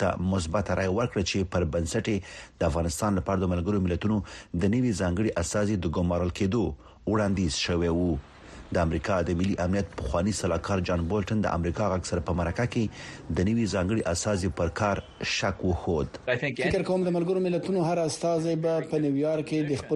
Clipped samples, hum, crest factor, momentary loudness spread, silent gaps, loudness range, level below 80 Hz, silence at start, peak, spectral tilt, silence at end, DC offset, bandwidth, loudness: under 0.1%; none; 16 dB; 4 LU; none; 1 LU; -44 dBFS; 0 s; -12 dBFS; -6 dB/octave; 0 s; under 0.1%; 11.5 kHz; -28 LUFS